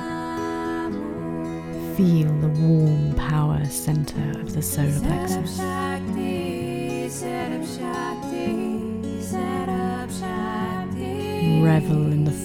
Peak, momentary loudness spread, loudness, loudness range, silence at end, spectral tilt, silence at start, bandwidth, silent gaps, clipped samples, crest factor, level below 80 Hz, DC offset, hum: -6 dBFS; 10 LU; -24 LUFS; 5 LU; 0 s; -6.5 dB/octave; 0 s; 16 kHz; none; under 0.1%; 16 dB; -42 dBFS; under 0.1%; none